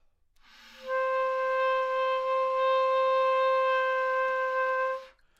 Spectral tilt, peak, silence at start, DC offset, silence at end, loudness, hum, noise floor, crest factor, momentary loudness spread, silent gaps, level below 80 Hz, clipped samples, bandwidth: -0.5 dB/octave; -18 dBFS; 0.75 s; under 0.1%; 0.3 s; -27 LUFS; none; -62 dBFS; 10 dB; 6 LU; none; -70 dBFS; under 0.1%; 7.2 kHz